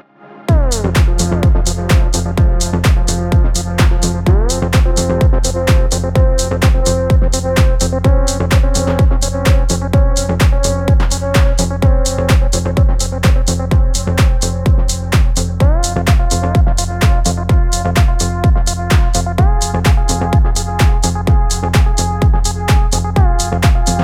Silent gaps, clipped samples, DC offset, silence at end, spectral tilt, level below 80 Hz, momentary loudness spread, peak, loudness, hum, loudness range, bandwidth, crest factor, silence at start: none; under 0.1%; under 0.1%; 0 s; -5 dB/octave; -14 dBFS; 2 LU; 0 dBFS; -14 LUFS; none; 1 LU; 15.5 kHz; 12 dB; 0.3 s